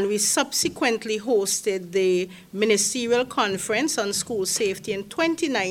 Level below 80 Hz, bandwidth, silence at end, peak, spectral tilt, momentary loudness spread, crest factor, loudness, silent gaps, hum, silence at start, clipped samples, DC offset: -62 dBFS; 17.5 kHz; 0 s; -6 dBFS; -2.5 dB/octave; 5 LU; 18 dB; -23 LUFS; none; none; 0 s; under 0.1%; under 0.1%